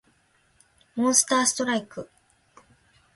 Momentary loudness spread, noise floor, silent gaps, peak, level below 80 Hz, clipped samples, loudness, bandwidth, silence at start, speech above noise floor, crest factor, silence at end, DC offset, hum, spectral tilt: 20 LU; -65 dBFS; none; -6 dBFS; -68 dBFS; under 0.1%; -22 LUFS; 12 kHz; 0.95 s; 41 dB; 22 dB; 1.1 s; under 0.1%; none; -1.5 dB/octave